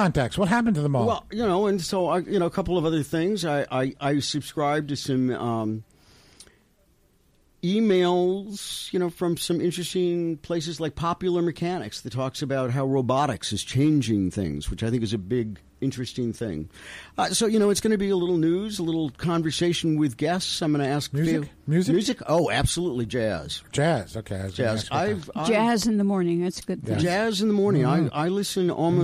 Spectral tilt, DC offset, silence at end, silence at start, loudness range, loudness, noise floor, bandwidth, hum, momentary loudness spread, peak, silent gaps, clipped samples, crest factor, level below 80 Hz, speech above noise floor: -5.5 dB/octave; under 0.1%; 0 s; 0 s; 4 LU; -25 LUFS; -62 dBFS; 15.5 kHz; none; 8 LU; -10 dBFS; none; under 0.1%; 14 dB; -48 dBFS; 38 dB